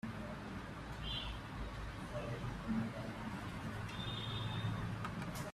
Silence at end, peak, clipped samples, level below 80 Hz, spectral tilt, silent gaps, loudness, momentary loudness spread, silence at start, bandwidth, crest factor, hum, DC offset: 0 s; -28 dBFS; under 0.1%; -54 dBFS; -5.5 dB/octave; none; -44 LUFS; 6 LU; 0.05 s; 14.5 kHz; 14 dB; none; under 0.1%